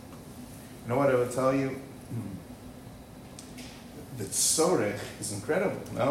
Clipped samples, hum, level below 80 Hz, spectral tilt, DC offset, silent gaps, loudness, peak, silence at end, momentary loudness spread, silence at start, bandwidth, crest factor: under 0.1%; none; -58 dBFS; -4 dB/octave; under 0.1%; none; -28 LUFS; -12 dBFS; 0 s; 21 LU; 0 s; 16 kHz; 18 dB